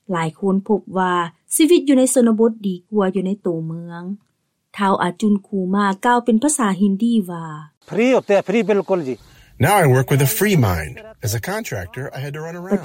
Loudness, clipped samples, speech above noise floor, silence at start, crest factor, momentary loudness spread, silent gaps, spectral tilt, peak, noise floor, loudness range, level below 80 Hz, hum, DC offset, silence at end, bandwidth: -18 LUFS; under 0.1%; 33 dB; 0.1 s; 14 dB; 15 LU; 7.77-7.81 s; -5.5 dB/octave; -4 dBFS; -51 dBFS; 3 LU; -48 dBFS; none; under 0.1%; 0 s; 16.5 kHz